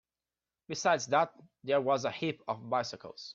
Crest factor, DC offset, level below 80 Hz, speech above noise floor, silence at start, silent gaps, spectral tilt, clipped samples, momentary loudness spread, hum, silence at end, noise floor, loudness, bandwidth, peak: 20 dB; under 0.1%; -78 dBFS; over 58 dB; 0.7 s; none; -4 dB/octave; under 0.1%; 13 LU; none; 0 s; under -90 dBFS; -32 LUFS; 7.8 kHz; -14 dBFS